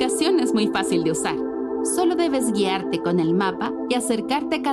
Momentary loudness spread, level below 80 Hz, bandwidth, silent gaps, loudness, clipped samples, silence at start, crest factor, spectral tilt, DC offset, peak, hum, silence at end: 5 LU; -56 dBFS; 13 kHz; none; -22 LUFS; under 0.1%; 0 s; 14 dB; -4.5 dB/octave; under 0.1%; -8 dBFS; none; 0 s